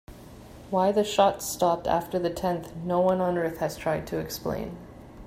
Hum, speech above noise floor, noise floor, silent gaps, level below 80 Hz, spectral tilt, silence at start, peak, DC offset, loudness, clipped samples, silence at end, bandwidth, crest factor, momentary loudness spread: none; 20 dB; -46 dBFS; none; -52 dBFS; -5 dB/octave; 0.1 s; -8 dBFS; under 0.1%; -27 LUFS; under 0.1%; 0 s; 16 kHz; 18 dB; 17 LU